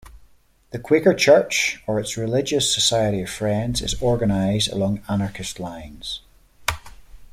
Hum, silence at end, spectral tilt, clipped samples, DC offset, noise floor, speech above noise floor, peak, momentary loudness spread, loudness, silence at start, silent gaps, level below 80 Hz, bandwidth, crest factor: none; 0.1 s; -4 dB/octave; under 0.1%; under 0.1%; -54 dBFS; 33 dB; -2 dBFS; 17 LU; -21 LUFS; 0.05 s; none; -42 dBFS; 16 kHz; 20 dB